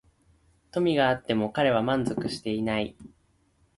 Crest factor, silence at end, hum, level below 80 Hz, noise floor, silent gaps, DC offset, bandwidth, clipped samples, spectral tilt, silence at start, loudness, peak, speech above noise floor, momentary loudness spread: 18 dB; 0.7 s; none; -58 dBFS; -66 dBFS; none; under 0.1%; 11.5 kHz; under 0.1%; -6 dB/octave; 0.75 s; -27 LUFS; -10 dBFS; 40 dB; 8 LU